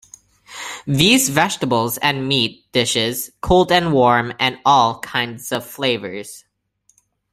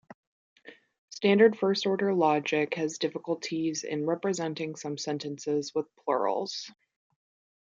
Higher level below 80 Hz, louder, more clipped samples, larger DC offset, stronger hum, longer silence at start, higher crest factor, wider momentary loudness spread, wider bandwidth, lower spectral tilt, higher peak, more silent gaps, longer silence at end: first, -42 dBFS vs -80 dBFS; first, -17 LUFS vs -29 LUFS; neither; neither; first, 50 Hz at -55 dBFS vs none; second, 0.5 s vs 0.65 s; about the same, 18 dB vs 22 dB; first, 15 LU vs 12 LU; first, 16 kHz vs 7.8 kHz; about the same, -3.5 dB/octave vs -4.5 dB/octave; first, 0 dBFS vs -8 dBFS; second, none vs 0.98-1.08 s; about the same, 0.95 s vs 0.95 s